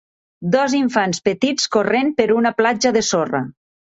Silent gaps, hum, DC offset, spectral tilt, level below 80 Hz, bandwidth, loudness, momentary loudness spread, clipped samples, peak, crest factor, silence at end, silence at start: none; none; under 0.1%; -4 dB/octave; -58 dBFS; 8 kHz; -18 LUFS; 6 LU; under 0.1%; -2 dBFS; 16 dB; 0.45 s; 0.4 s